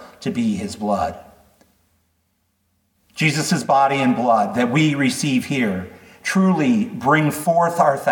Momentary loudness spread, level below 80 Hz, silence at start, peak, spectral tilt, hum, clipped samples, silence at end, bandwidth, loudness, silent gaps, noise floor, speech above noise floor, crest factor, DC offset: 8 LU; -58 dBFS; 0 s; -2 dBFS; -5.5 dB/octave; none; under 0.1%; 0 s; 19 kHz; -19 LUFS; none; -67 dBFS; 49 dB; 16 dB; under 0.1%